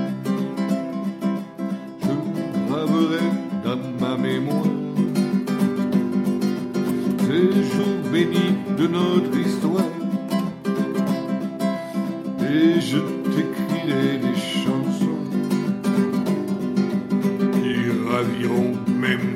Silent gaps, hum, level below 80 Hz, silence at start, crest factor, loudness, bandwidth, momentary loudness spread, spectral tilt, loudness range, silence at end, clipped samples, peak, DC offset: none; none; -64 dBFS; 0 s; 16 dB; -22 LUFS; 15.5 kHz; 6 LU; -7 dB/octave; 3 LU; 0 s; under 0.1%; -6 dBFS; under 0.1%